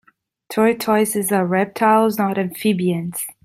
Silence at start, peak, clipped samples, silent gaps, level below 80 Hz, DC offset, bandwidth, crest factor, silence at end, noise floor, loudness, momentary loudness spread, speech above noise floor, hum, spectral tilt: 0.5 s; -2 dBFS; under 0.1%; none; -64 dBFS; under 0.1%; 16 kHz; 16 dB; 0.15 s; -43 dBFS; -18 LUFS; 6 LU; 25 dB; none; -5 dB/octave